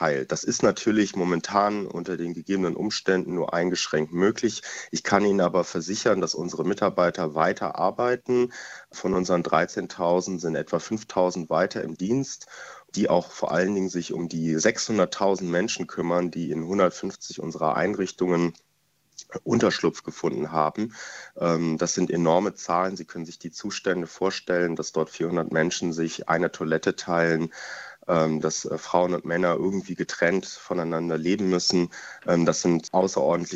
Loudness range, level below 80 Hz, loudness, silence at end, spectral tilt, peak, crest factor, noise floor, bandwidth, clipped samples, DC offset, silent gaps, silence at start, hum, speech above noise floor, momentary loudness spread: 2 LU; -62 dBFS; -25 LUFS; 0 s; -4.5 dB/octave; -4 dBFS; 22 dB; -68 dBFS; 8.2 kHz; under 0.1%; under 0.1%; none; 0 s; none; 43 dB; 9 LU